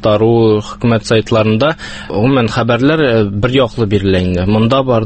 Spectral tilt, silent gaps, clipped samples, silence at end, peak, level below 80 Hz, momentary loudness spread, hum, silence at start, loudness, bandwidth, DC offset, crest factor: -7 dB/octave; none; under 0.1%; 0 s; 0 dBFS; -34 dBFS; 4 LU; none; 0 s; -12 LUFS; 8.8 kHz; under 0.1%; 12 dB